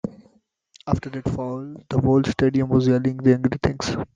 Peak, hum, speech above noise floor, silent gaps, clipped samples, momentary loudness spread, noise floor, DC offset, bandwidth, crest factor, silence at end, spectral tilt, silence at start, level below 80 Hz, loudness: -4 dBFS; none; 39 dB; none; under 0.1%; 11 LU; -60 dBFS; under 0.1%; 7.6 kHz; 18 dB; 0.1 s; -7.5 dB/octave; 0.05 s; -46 dBFS; -22 LUFS